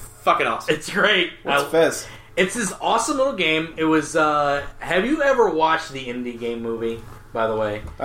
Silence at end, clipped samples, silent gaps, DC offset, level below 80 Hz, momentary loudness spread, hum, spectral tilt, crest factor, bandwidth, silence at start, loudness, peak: 0 s; under 0.1%; none; under 0.1%; -46 dBFS; 11 LU; none; -3.5 dB/octave; 16 dB; 16 kHz; 0 s; -21 LUFS; -4 dBFS